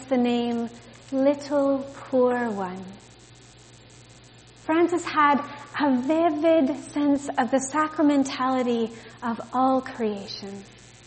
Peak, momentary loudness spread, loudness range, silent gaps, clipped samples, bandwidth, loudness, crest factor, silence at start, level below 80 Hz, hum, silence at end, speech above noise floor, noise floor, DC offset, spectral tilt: -8 dBFS; 13 LU; 5 LU; none; under 0.1%; 8.8 kHz; -24 LUFS; 18 dB; 0 s; -62 dBFS; none; 0.4 s; 26 dB; -50 dBFS; under 0.1%; -5 dB/octave